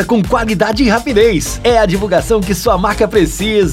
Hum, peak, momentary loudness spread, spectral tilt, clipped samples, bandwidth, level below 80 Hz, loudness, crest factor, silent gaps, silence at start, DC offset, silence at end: none; 0 dBFS; 3 LU; -5 dB/octave; under 0.1%; 16.5 kHz; -26 dBFS; -12 LUFS; 12 dB; none; 0 s; under 0.1%; 0 s